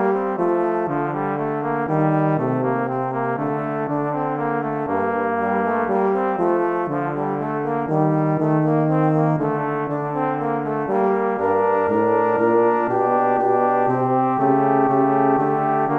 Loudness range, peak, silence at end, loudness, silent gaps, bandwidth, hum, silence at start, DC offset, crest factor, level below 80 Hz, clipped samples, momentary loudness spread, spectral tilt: 4 LU; -6 dBFS; 0 s; -20 LUFS; none; 4.2 kHz; none; 0 s; under 0.1%; 14 dB; -64 dBFS; under 0.1%; 6 LU; -10.5 dB/octave